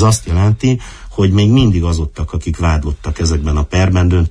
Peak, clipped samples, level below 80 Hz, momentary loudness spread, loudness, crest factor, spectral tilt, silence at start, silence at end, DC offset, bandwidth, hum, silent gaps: -2 dBFS; under 0.1%; -22 dBFS; 10 LU; -14 LUFS; 12 dB; -6 dB/octave; 0 s; 0 s; under 0.1%; 11 kHz; none; none